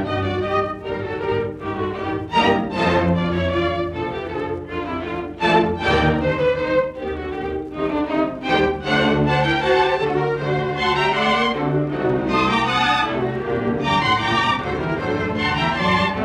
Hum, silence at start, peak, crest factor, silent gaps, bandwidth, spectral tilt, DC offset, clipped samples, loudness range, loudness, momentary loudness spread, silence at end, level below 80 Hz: none; 0 s; -4 dBFS; 16 dB; none; 11 kHz; -6 dB/octave; under 0.1%; under 0.1%; 2 LU; -20 LUFS; 9 LU; 0 s; -40 dBFS